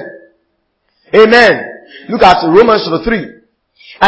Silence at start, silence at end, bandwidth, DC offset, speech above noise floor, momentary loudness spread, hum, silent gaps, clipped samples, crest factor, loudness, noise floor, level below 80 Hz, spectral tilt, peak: 0 s; 0 s; 8 kHz; under 0.1%; 55 dB; 19 LU; none; none; 2%; 10 dB; -8 LUFS; -63 dBFS; -40 dBFS; -5.5 dB/octave; 0 dBFS